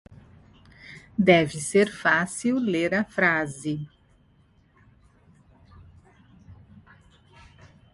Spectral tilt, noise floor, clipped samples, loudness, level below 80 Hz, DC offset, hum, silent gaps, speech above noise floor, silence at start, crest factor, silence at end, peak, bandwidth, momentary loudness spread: -5 dB/octave; -60 dBFS; under 0.1%; -23 LUFS; -58 dBFS; under 0.1%; none; none; 37 dB; 0.85 s; 24 dB; 1.4 s; -4 dBFS; 11.5 kHz; 15 LU